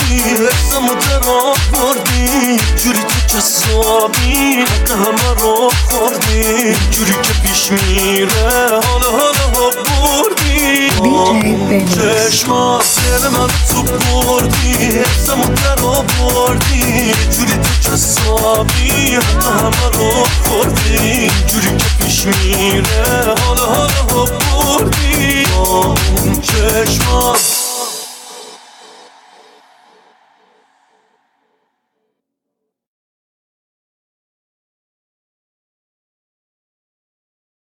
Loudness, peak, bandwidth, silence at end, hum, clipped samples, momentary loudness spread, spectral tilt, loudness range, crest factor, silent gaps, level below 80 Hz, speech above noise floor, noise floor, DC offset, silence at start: -11 LUFS; 0 dBFS; 19.5 kHz; 9.15 s; none; under 0.1%; 2 LU; -3.5 dB/octave; 1 LU; 12 dB; none; -20 dBFS; 64 dB; -76 dBFS; under 0.1%; 0 s